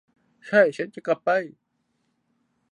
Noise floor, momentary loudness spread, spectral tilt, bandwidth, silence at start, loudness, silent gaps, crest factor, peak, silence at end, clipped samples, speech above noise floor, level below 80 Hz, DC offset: -73 dBFS; 11 LU; -6 dB/octave; 10 kHz; 0.45 s; -23 LUFS; none; 20 dB; -6 dBFS; 1.25 s; under 0.1%; 51 dB; -78 dBFS; under 0.1%